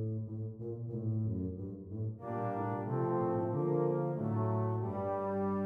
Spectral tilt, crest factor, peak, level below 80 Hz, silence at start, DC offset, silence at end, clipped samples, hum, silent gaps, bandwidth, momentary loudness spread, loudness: -12 dB/octave; 14 dB; -22 dBFS; -66 dBFS; 0 s; under 0.1%; 0 s; under 0.1%; none; none; 3.1 kHz; 9 LU; -36 LUFS